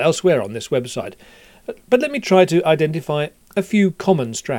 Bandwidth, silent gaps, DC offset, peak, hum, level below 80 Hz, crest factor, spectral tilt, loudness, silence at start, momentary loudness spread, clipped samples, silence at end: 17 kHz; none; under 0.1%; 0 dBFS; none; -58 dBFS; 18 dB; -5.5 dB/octave; -18 LUFS; 0 s; 15 LU; under 0.1%; 0 s